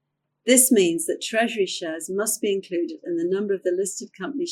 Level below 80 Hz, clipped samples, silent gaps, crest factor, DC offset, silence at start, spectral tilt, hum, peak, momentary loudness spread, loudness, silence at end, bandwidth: -74 dBFS; under 0.1%; none; 20 dB; under 0.1%; 0.45 s; -2.5 dB/octave; none; -2 dBFS; 13 LU; -23 LUFS; 0 s; 17 kHz